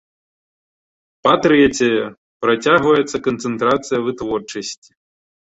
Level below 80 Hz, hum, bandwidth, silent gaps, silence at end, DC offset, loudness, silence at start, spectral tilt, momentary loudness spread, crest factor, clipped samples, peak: -52 dBFS; none; 8.2 kHz; 2.17-2.40 s; 0.85 s; under 0.1%; -17 LUFS; 1.25 s; -4.5 dB/octave; 14 LU; 18 dB; under 0.1%; -2 dBFS